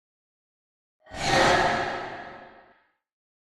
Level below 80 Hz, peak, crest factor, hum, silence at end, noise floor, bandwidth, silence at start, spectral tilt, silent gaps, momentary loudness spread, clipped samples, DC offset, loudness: -50 dBFS; -8 dBFS; 20 dB; none; 1 s; -63 dBFS; 13.5 kHz; 1.1 s; -3.5 dB/octave; none; 22 LU; under 0.1%; under 0.1%; -23 LUFS